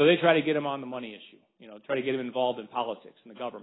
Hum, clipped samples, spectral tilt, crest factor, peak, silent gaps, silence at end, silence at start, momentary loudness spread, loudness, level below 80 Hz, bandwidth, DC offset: none; under 0.1%; -9.5 dB/octave; 20 dB; -8 dBFS; none; 0 s; 0 s; 19 LU; -28 LUFS; -76 dBFS; 4.1 kHz; under 0.1%